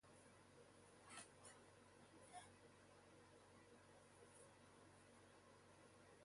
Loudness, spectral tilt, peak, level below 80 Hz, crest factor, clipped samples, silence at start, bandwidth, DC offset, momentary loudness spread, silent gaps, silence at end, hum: -66 LUFS; -3.5 dB/octave; -44 dBFS; -84 dBFS; 22 dB; under 0.1%; 0 s; 11.5 kHz; under 0.1%; 7 LU; none; 0 s; none